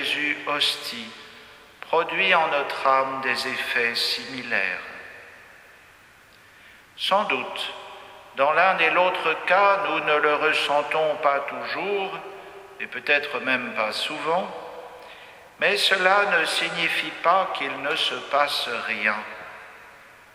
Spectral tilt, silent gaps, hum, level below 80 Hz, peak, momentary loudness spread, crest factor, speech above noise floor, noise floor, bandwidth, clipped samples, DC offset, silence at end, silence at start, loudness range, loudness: -2 dB/octave; none; none; -68 dBFS; -4 dBFS; 21 LU; 22 dB; 29 dB; -52 dBFS; 16 kHz; under 0.1%; under 0.1%; 0.25 s; 0 s; 7 LU; -22 LUFS